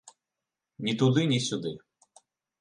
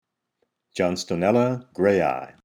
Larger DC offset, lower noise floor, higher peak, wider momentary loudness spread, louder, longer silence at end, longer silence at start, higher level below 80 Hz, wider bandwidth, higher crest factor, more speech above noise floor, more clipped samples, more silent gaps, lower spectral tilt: neither; first, -88 dBFS vs -74 dBFS; second, -12 dBFS vs -6 dBFS; first, 13 LU vs 6 LU; second, -27 LUFS vs -23 LUFS; first, 0.85 s vs 0.2 s; second, 0.05 s vs 0.75 s; second, -70 dBFS vs -60 dBFS; second, 11 kHz vs 15.5 kHz; about the same, 20 dB vs 18 dB; first, 62 dB vs 52 dB; neither; neither; about the same, -5.5 dB/octave vs -6 dB/octave